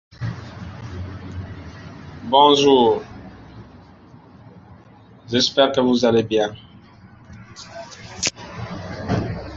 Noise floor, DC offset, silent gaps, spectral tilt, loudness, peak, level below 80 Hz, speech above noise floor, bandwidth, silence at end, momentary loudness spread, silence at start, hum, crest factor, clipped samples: -47 dBFS; under 0.1%; none; -4.5 dB/octave; -18 LUFS; -2 dBFS; -46 dBFS; 31 dB; 8 kHz; 0 s; 24 LU; 0.2 s; none; 20 dB; under 0.1%